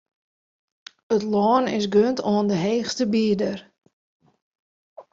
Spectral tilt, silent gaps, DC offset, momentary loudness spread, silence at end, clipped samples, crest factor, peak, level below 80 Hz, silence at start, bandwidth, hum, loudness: -6 dB/octave; 3.93-4.20 s, 4.42-4.52 s, 4.59-4.96 s; under 0.1%; 5 LU; 0.1 s; under 0.1%; 18 dB; -6 dBFS; -64 dBFS; 1.1 s; 7.6 kHz; none; -22 LUFS